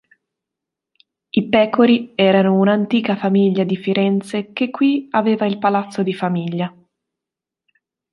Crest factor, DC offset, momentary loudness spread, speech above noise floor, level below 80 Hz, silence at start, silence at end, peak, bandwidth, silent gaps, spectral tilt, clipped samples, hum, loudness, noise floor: 16 dB; under 0.1%; 9 LU; 69 dB; -64 dBFS; 1.35 s; 1.45 s; -2 dBFS; 11.5 kHz; none; -7.5 dB/octave; under 0.1%; none; -17 LUFS; -86 dBFS